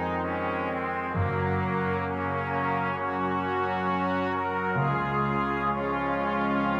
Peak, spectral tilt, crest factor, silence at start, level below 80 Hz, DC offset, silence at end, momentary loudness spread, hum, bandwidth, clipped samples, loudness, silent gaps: -14 dBFS; -8.5 dB/octave; 12 dB; 0 s; -52 dBFS; under 0.1%; 0 s; 3 LU; none; 7.4 kHz; under 0.1%; -28 LUFS; none